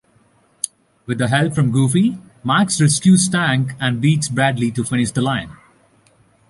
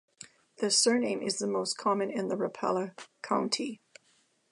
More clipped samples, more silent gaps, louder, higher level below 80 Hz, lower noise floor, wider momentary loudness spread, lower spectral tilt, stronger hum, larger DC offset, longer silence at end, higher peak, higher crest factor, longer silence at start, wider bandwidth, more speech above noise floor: neither; neither; first, -17 LUFS vs -30 LUFS; first, -52 dBFS vs -84 dBFS; second, -56 dBFS vs -69 dBFS; second, 13 LU vs 21 LU; first, -5 dB/octave vs -3 dB/octave; neither; neither; first, 1 s vs 0.75 s; first, -2 dBFS vs -12 dBFS; about the same, 16 dB vs 18 dB; first, 0.65 s vs 0.2 s; about the same, 11.5 kHz vs 11.5 kHz; about the same, 40 dB vs 39 dB